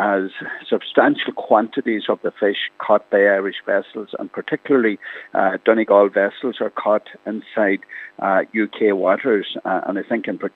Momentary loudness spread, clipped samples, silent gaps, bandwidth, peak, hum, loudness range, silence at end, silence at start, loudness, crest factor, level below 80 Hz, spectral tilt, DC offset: 10 LU; under 0.1%; none; 4.3 kHz; 0 dBFS; none; 2 LU; 0.05 s; 0 s; -19 LUFS; 20 dB; -80 dBFS; -7.5 dB/octave; under 0.1%